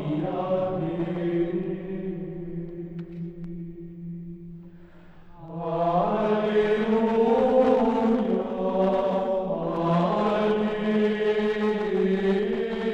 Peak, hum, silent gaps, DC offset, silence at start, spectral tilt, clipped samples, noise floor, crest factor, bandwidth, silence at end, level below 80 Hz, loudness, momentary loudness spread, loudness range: -8 dBFS; none; none; under 0.1%; 0 s; -8.5 dB/octave; under 0.1%; -47 dBFS; 16 dB; 8 kHz; 0 s; -50 dBFS; -25 LUFS; 16 LU; 14 LU